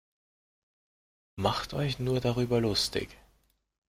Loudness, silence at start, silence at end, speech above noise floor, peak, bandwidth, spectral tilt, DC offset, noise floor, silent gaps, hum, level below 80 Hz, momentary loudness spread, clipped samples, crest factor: -30 LUFS; 1.35 s; 0.75 s; 40 dB; -10 dBFS; 16 kHz; -5 dB/octave; under 0.1%; -69 dBFS; none; none; -52 dBFS; 9 LU; under 0.1%; 22 dB